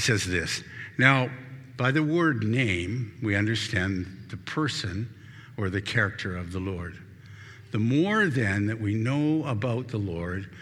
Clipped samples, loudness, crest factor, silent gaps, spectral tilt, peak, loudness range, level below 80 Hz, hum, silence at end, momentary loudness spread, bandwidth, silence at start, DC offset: under 0.1%; -27 LUFS; 24 dB; none; -5.5 dB/octave; -4 dBFS; 6 LU; -56 dBFS; none; 0 s; 16 LU; 13.5 kHz; 0 s; under 0.1%